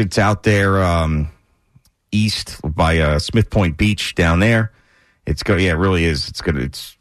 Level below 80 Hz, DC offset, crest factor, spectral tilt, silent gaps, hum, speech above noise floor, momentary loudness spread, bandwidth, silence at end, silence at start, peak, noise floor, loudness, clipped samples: -30 dBFS; under 0.1%; 12 dB; -6 dB/octave; none; none; 39 dB; 9 LU; 13.5 kHz; 0.1 s; 0 s; -6 dBFS; -56 dBFS; -17 LUFS; under 0.1%